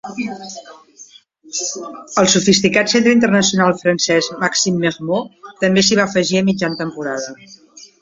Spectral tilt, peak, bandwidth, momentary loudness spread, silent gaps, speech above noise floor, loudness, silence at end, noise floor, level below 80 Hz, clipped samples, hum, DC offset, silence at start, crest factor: -3.5 dB/octave; 0 dBFS; 7.8 kHz; 13 LU; none; 28 dB; -15 LUFS; 0.15 s; -44 dBFS; -56 dBFS; under 0.1%; none; under 0.1%; 0.05 s; 16 dB